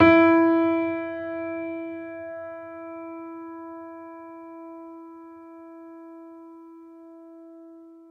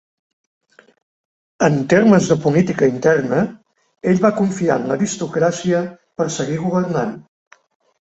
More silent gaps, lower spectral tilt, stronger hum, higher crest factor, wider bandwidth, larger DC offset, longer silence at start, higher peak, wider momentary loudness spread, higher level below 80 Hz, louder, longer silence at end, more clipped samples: neither; first, -8.5 dB/octave vs -6 dB/octave; neither; first, 22 dB vs 16 dB; second, 5.2 kHz vs 8.2 kHz; neither; second, 0 s vs 1.6 s; about the same, -4 dBFS vs -2 dBFS; first, 26 LU vs 10 LU; second, -64 dBFS vs -56 dBFS; second, -24 LUFS vs -17 LUFS; second, 0.25 s vs 0.8 s; neither